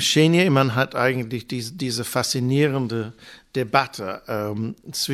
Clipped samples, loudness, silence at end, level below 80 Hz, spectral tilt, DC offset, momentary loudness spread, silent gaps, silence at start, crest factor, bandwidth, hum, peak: under 0.1%; -22 LUFS; 0 s; -60 dBFS; -4.5 dB/octave; under 0.1%; 13 LU; none; 0 s; 20 dB; 16 kHz; none; -2 dBFS